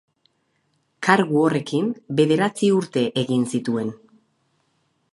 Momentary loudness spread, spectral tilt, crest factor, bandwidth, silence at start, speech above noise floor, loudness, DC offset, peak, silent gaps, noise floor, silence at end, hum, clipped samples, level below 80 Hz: 7 LU; -6 dB/octave; 22 dB; 11.5 kHz; 1 s; 49 dB; -21 LUFS; under 0.1%; 0 dBFS; none; -69 dBFS; 1.2 s; none; under 0.1%; -68 dBFS